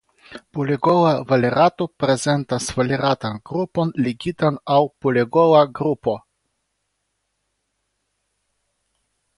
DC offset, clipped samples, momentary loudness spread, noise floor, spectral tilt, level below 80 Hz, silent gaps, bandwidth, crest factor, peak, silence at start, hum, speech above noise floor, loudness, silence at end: under 0.1%; under 0.1%; 9 LU; -74 dBFS; -6 dB/octave; -56 dBFS; none; 11.5 kHz; 18 dB; -2 dBFS; 0.3 s; none; 55 dB; -19 LUFS; 3.2 s